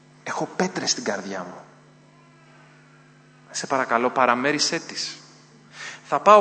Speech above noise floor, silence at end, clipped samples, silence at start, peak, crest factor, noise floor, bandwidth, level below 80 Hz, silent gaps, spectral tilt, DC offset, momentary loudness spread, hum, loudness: 31 dB; 0 s; under 0.1%; 0.25 s; 0 dBFS; 24 dB; -52 dBFS; 9.2 kHz; -76 dBFS; none; -3 dB/octave; under 0.1%; 17 LU; none; -23 LUFS